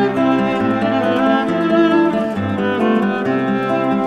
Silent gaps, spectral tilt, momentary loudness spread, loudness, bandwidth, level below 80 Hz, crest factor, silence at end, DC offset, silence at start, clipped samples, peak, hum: none; -7.5 dB/octave; 5 LU; -16 LUFS; 9.6 kHz; -52 dBFS; 14 dB; 0 s; under 0.1%; 0 s; under 0.1%; -2 dBFS; none